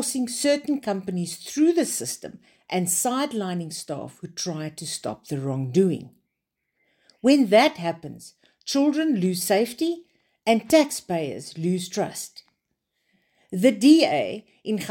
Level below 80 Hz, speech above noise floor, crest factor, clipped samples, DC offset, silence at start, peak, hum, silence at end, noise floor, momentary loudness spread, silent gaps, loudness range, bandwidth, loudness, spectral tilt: -70 dBFS; 57 dB; 20 dB; under 0.1%; under 0.1%; 0 s; -4 dBFS; none; 0 s; -81 dBFS; 16 LU; none; 5 LU; 17 kHz; -23 LUFS; -4.5 dB/octave